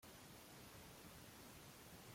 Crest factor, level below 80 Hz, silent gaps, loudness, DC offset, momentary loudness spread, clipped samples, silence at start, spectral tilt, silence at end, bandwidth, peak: 14 dB; -74 dBFS; none; -59 LUFS; under 0.1%; 1 LU; under 0.1%; 0 s; -3.5 dB/octave; 0 s; 16.5 kHz; -48 dBFS